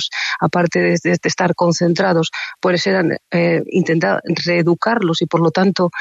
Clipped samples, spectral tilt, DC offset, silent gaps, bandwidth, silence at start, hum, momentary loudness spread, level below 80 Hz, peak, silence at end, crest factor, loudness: under 0.1%; -5.5 dB/octave; under 0.1%; none; 8 kHz; 0 s; none; 3 LU; -60 dBFS; -2 dBFS; 0 s; 14 dB; -16 LUFS